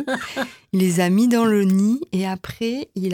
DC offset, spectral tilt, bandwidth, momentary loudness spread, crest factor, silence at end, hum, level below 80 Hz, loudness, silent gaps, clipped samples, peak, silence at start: under 0.1%; -6 dB/octave; 17.5 kHz; 10 LU; 14 dB; 0 s; none; -56 dBFS; -20 LUFS; none; under 0.1%; -6 dBFS; 0 s